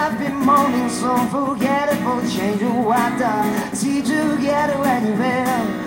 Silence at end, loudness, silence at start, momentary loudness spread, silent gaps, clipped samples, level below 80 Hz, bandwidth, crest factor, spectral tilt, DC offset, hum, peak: 0 s; -19 LUFS; 0 s; 5 LU; none; under 0.1%; -52 dBFS; 17 kHz; 14 dB; -5 dB/octave; under 0.1%; none; -4 dBFS